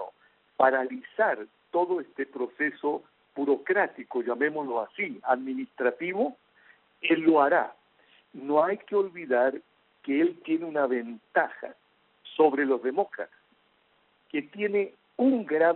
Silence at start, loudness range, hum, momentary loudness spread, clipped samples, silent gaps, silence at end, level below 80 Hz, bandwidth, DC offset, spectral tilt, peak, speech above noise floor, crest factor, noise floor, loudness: 0 s; 3 LU; none; 12 LU; under 0.1%; none; 0 s; -80 dBFS; 4.2 kHz; under 0.1%; -3 dB/octave; -6 dBFS; 40 dB; 22 dB; -67 dBFS; -27 LUFS